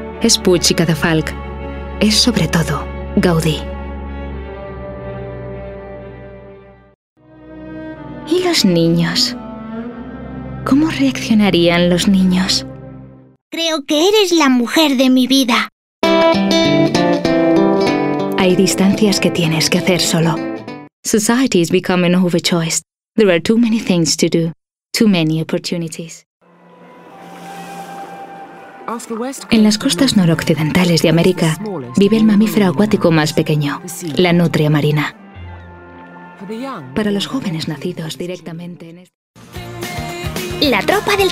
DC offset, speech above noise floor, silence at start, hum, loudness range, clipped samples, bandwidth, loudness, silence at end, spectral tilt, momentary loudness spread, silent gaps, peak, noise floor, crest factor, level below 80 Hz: under 0.1%; 30 dB; 0 s; none; 12 LU; under 0.1%; 16 kHz; -14 LUFS; 0 s; -4.5 dB/octave; 19 LU; 6.95-7.16 s, 13.41-13.51 s, 15.72-16.02 s, 20.93-21.03 s, 26.26-26.40 s, 39.14-39.34 s; 0 dBFS; -43 dBFS; 16 dB; -38 dBFS